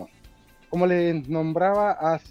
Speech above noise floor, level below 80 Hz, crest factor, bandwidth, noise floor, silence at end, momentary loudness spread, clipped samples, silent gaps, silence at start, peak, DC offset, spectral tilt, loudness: 30 dB; -56 dBFS; 16 dB; 8.6 kHz; -52 dBFS; 0 s; 5 LU; under 0.1%; none; 0 s; -8 dBFS; under 0.1%; -8.5 dB/octave; -23 LUFS